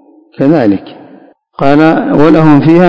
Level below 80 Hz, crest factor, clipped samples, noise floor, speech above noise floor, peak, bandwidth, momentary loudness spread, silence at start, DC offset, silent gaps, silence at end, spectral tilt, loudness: -42 dBFS; 8 dB; 7%; -39 dBFS; 33 dB; 0 dBFS; 7.2 kHz; 8 LU; 0.35 s; under 0.1%; none; 0 s; -9 dB/octave; -8 LUFS